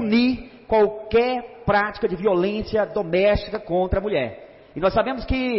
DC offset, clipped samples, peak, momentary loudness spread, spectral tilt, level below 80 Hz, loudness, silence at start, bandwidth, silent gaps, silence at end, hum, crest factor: under 0.1%; under 0.1%; -8 dBFS; 6 LU; -10.5 dB/octave; -38 dBFS; -22 LUFS; 0 s; 5.8 kHz; none; 0 s; none; 12 dB